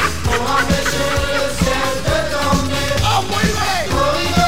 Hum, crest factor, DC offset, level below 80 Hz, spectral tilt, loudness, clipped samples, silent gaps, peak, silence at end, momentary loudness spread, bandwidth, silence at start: none; 16 dB; 5%; -28 dBFS; -4 dB/octave; -17 LUFS; under 0.1%; none; -2 dBFS; 0 s; 2 LU; 16.5 kHz; 0 s